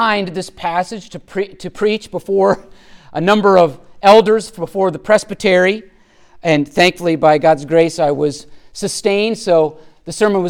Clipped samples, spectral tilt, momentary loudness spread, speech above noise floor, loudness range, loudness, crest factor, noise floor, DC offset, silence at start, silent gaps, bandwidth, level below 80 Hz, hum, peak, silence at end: under 0.1%; -5 dB/octave; 14 LU; 30 dB; 3 LU; -15 LUFS; 14 dB; -44 dBFS; under 0.1%; 0 s; none; 16 kHz; -48 dBFS; none; 0 dBFS; 0 s